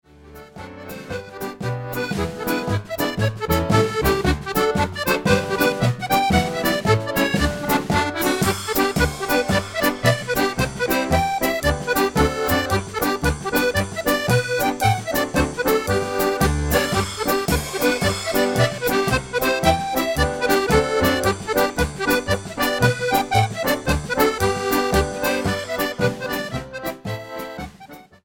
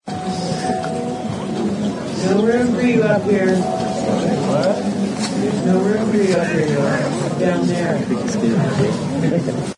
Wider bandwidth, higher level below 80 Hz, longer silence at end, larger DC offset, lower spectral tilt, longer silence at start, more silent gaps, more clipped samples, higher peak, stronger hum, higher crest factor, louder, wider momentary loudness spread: first, 19 kHz vs 11 kHz; first, -34 dBFS vs -54 dBFS; first, 0.2 s vs 0.05 s; neither; second, -4.5 dB/octave vs -6.5 dB/octave; first, 0.25 s vs 0.05 s; neither; neither; about the same, -2 dBFS vs -4 dBFS; neither; about the same, 18 dB vs 14 dB; second, -21 LUFS vs -18 LUFS; about the same, 8 LU vs 6 LU